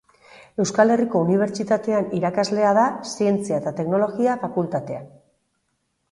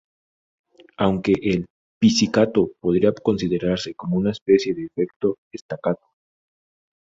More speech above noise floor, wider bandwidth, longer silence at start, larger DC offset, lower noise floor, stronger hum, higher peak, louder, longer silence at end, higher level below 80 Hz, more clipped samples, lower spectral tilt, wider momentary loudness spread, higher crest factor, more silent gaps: second, 52 dB vs over 69 dB; first, 11.5 kHz vs 7.8 kHz; second, 0.35 s vs 1 s; neither; second, -72 dBFS vs under -90 dBFS; neither; about the same, -4 dBFS vs -4 dBFS; about the same, -21 LUFS vs -21 LUFS; about the same, 1.05 s vs 1.05 s; second, -64 dBFS vs -52 dBFS; neither; about the same, -6 dB/octave vs -6 dB/octave; about the same, 8 LU vs 9 LU; about the same, 18 dB vs 18 dB; second, none vs 1.70-2.01 s, 4.42-4.46 s, 5.16-5.20 s, 5.38-5.51 s, 5.61-5.69 s